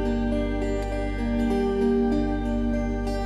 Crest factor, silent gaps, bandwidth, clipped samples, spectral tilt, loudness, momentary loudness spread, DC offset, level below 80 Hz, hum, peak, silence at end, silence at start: 12 dB; none; 12 kHz; under 0.1%; -7.5 dB/octave; -26 LUFS; 5 LU; under 0.1%; -30 dBFS; 50 Hz at -35 dBFS; -12 dBFS; 0 s; 0 s